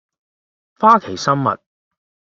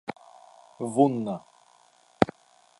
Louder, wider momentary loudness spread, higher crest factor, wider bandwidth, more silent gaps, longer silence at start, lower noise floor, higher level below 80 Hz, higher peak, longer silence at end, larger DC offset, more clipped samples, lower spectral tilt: first, -16 LUFS vs -27 LUFS; second, 9 LU vs 16 LU; second, 18 dB vs 28 dB; second, 7.8 kHz vs 11.5 kHz; neither; first, 0.8 s vs 0.1 s; first, under -90 dBFS vs -60 dBFS; about the same, -62 dBFS vs -60 dBFS; about the same, 0 dBFS vs -2 dBFS; first, 0.75 s vs 0.55 s; neither; neither; about the same, -5.5 dB/octave vs -6.5 dB/octave